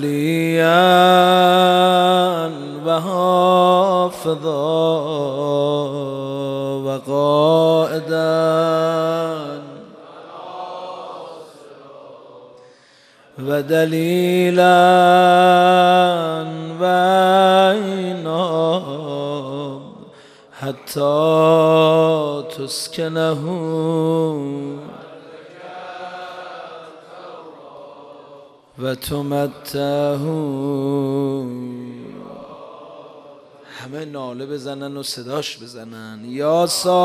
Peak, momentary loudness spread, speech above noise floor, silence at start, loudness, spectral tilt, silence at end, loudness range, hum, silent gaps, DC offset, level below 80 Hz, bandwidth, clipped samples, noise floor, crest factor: 0 dBFS; 22 LU; 32 dB; 0 s; -17 LUFS; -5.5 dB/octave; 0 s; 19 LU; none; none; under 0.1%; -62 dBFS; 15 kHz; under 0.1%; -50 dBFS; 18 dB